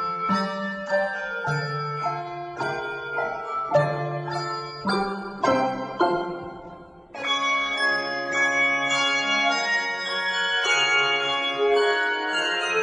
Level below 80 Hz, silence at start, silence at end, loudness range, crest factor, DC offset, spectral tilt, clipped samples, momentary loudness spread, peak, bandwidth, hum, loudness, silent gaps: -62 dBFS; 0 s; 0 s; 6 LU; 18 dB; under 0.1%; -3.5 dB/octave; under 0.1%; 10 LU; -8 dBFS; 11 kHz; none; -23 LUFS; none